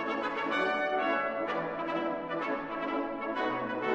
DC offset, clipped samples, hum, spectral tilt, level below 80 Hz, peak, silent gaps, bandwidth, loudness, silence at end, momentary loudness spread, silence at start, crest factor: under 0.1%; under 0.1%; none; -5.5 dB/octave; -66 dBFS; -16 dBFS; none; 8.6 kHz; -32 LUFS; 0 s; 5 LU; 0 s; 16 dB